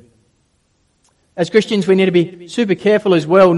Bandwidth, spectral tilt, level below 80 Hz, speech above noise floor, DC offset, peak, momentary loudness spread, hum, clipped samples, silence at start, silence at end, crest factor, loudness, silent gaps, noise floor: 11.5 kHz; -6.5 dB/octave; -58 dBFS; 48 dB; under 0.1%; 0 dBFS; 9 LU; none; under 0.1%; 1.35 s; 0 s; 14 dB; -15 LUFS; none; -61 dBFS